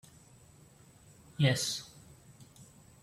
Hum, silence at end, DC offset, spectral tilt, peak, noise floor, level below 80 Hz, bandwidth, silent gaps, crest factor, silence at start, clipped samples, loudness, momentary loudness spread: none; 0.4 s; under 0.1%; -4 dB/octave; -14 dBFS; -59 dBFS; -68 dBFS; 15.5 kHz; none; 24 dB; 1.4 s; under 0.1%; -31 LUFS; 28 LU